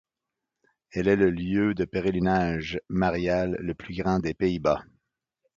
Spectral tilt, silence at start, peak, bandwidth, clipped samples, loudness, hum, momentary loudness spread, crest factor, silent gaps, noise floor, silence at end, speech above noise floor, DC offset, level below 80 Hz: -7.5 dB/octave; 0.95 s; -8 dBFS; 7.4 kHz; under 0.1%; -26 LUFS; none; 8 LU; 18 dB; none; -87 dBFS; 0.75 s; 61 dB; under 0.1%; -48 dBFS